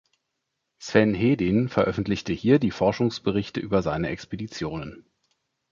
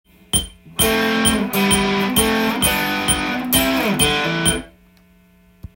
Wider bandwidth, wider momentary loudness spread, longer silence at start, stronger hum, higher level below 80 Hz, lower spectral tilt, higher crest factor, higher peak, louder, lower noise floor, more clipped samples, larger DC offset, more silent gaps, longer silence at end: second, 7.4 kHz vs 17 kHz; first, 12 LU vs 4 LU; first, 0.8 s vs 0.35 s; neither; second, -50 dBFS vs -36 dBFS; first, -7 dB/octave vs -3 dB/octave; about the same, 22 dB vs 18 dB; second, -4 dBFS vs 0 dBFS; second, -24 LUFS vs -17 LUFS; first, -80 dBFS vs -52 dBFS; neither; neither; neither; second, 0.7 s vs 1.1 s